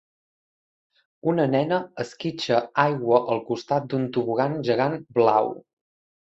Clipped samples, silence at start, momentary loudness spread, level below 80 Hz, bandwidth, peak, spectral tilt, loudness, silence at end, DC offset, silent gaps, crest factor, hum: under 0.1%; 1.25 s; 9 LU; -68 dBFS; 8 kHz; -4 dBFS; -7 dB/octave; -24 LUFS; 0.8 s; under 0.1%; none; 20 dB; none